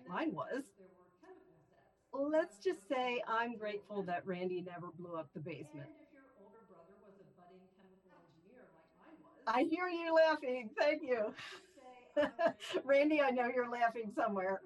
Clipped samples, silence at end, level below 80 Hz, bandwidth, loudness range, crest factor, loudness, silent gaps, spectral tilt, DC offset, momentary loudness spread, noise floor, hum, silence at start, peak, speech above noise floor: under 0.1%; 0 s; -84 dBFS; 12 kHz; 14 LU; 18 dB; -37 LUFS; none; -5.5 dB/octave; under 0.1%; 17 LU; -71 dBFS; none; 0 s; -20 dBFS; 35 dB